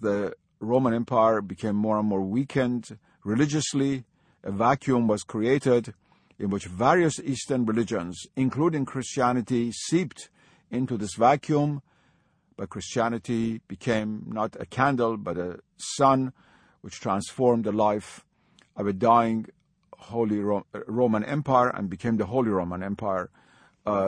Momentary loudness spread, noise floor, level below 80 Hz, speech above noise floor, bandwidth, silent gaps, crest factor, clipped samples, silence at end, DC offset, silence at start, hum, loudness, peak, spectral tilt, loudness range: 13 LU; -66 dBFS; -60 dBFS; 40 dB; 10.5 kHz; none; 20 dB; under 0.1%; 0 s; under 0.1%; 0 s; none; -26 LUFS; -6 dBFS; -6 dB/octave; 3 LU